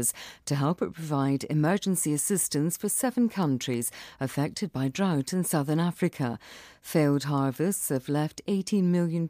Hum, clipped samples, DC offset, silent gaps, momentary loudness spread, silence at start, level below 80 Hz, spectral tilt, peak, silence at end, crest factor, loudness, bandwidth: none; under 0.1%; under 0.1%; none; 7 LU; 0 s; -66 dBFS; -5.5 dB/octave; -12 dBFS; 0 s; 14 dB; -28 LUFS; 15.5 kHz